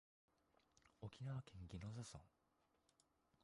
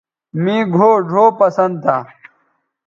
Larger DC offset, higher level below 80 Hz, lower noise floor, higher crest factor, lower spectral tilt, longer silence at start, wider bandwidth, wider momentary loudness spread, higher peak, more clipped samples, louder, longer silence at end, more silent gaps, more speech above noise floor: neither; second, -72 dBFS vs -64 dBFS; first, -83 dBFS vs -64 dBFS; about the same, 16 dB vs 14 dB; second, -6 dB/octave vs -8 dB/octave; first, 0.85 s vs 0.35 s; first, 11 kHz vs 7.2 kHz; about the same, 8 LU vs 9 LU; second, -40 dBFS vs 0 dBFS; neither; second, -55 LUFS vs -14 LUFS; first, 1.15 s vs 0.8 s; neither; second, 29 dB vs 50 dB